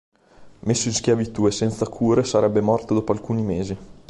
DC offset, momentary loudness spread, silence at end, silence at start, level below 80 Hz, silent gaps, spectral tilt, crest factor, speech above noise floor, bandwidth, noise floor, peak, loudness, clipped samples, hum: under 0.1%; 6 LU; 0.15 s; 0.4 s; -48 dBFS; none; -5.5 dB/octave; 16 dB; 26 dB; 11.5 kHz; -47 dBFS; -6 dBFS; -22 LUFS; under 0.1%; none